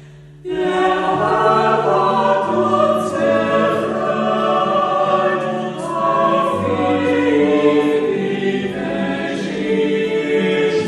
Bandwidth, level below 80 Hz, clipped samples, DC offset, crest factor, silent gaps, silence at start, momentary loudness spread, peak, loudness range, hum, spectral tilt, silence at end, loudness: 12 kHz; -54 dBFS; under 0.1%; under 0.1%; 14 dB; none; 0 s; 7 LU; -2 dBFS; 2 LU; none; -6 dB/octave; 0 s; -17 LUFS